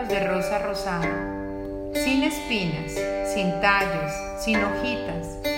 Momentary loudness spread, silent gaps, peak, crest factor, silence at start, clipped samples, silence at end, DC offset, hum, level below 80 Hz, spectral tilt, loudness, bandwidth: 9 LU; none; -6 dBFS; 20 dB; 0 s; under 0.1%; 0 s; under 0.1%; none; -42 dBFS; -4.5 dB/octave; -25 LUFS; 16.5 kHz